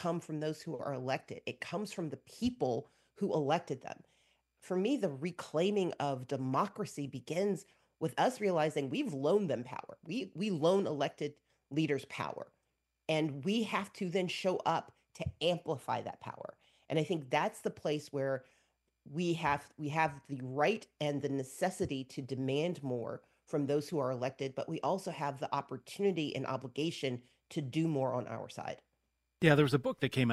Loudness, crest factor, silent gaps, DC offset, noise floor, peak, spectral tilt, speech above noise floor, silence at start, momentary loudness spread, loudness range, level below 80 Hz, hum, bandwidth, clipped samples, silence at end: -36 LUFS; 26 dB; none; under 0.1%; -83 dBFS; -10 dBFS; -6 dB/octave; 48 dB; 0 s; 11 LU; 3 LU; -70 dBFS; none; 12.5 kHz; under 0.1%; 0 s